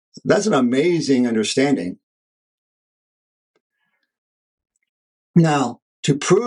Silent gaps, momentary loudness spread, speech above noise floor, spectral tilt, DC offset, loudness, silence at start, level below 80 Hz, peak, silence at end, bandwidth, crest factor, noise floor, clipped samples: 2.03-3.54 s, 3.60-3.70 s, 4.18-4.58 s, 4.89-5.34 s, 5.82-6.03 s; 7 LU; over 73 dB; -5.5 dB/octave; under 0.1%; -18 LUFS; 0.25 s; -66 dBFS; -2 dBFS; 0 s; 11.5 kHz; 18 dB; under -90 dBFS; under 0.1%